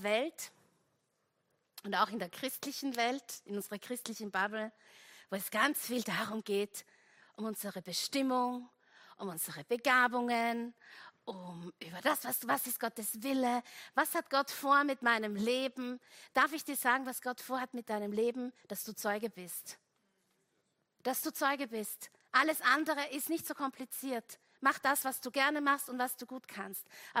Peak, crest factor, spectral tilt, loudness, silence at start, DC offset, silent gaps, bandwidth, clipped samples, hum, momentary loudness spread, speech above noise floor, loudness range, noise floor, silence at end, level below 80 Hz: -14 dBFS; 22 dB; -2.5 dB/octave; -35 LUFS; 0 s; under 0.1%; none; 16 kHz; under 0.1%; none; 15 LU; 45 dB; 6 LU; -80 dBFS; 0 s; -84 dBFS